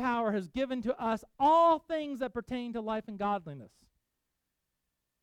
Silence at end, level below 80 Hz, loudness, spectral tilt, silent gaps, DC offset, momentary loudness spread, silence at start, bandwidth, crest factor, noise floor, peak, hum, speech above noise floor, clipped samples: 1.55 s; -64 dBFS; -31 LUFS; -6.5 dB/octave; none; under 0.1%; 13 LU; 0 s; 12 kHz; 16 dB; -84 dBFS; -16 dBFS; none; 53 dB; under 0.1%